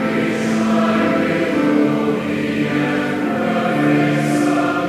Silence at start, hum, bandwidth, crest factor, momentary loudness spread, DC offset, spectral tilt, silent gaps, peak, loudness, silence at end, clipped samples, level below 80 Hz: 0 s; none; 15 kHz; 14 dB; 4 LU; under 0.1%; -6.5 dB/octave; none; -4 dBFS; -17 LUFS; 0 s; under 0.1%; -52 dBFS